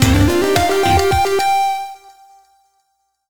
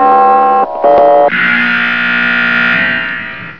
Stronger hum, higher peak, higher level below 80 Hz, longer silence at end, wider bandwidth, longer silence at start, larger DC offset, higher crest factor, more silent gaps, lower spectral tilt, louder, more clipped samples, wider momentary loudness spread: neither; about the same, 0 dBFS vs 0 dBFS; first, -30 dBFS vs -48 dBFS; about the same, 0 s vs 0 s; first, over 20 kHz vs 5.4 kHz; about the same, 0 s vs 0 s; second, under 0.1% vs 1%; first, 16 dB vs 10 dB; neither; about the same, -5 dB/octave vs -6 dB/octave; second, -15 LUFS vs -9 LUFS; neither; first, 8 LU vs 5 LU